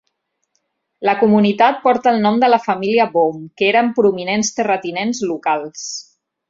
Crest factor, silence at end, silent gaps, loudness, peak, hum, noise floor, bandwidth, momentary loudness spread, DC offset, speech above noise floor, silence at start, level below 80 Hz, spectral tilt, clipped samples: 16 dB; 0.5 s; none; -16 LUFS; 0 dBFS; none; -71 dBFS; 7.8 kHz; 8 LU; under 0.1%; 56 dB; 1 s; -62 dBFS; -4.5 dB/octave; under 0.1%